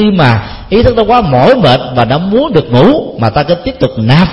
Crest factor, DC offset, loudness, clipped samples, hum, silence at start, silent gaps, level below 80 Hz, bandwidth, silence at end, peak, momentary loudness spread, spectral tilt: 8 dB; under 0.1%; -9 LUFS; 0.9%; none; 0 s; none; -28 dBFS; 9 kHz; 0 s; 0 dBFS; 6 LU; -8 dB/octave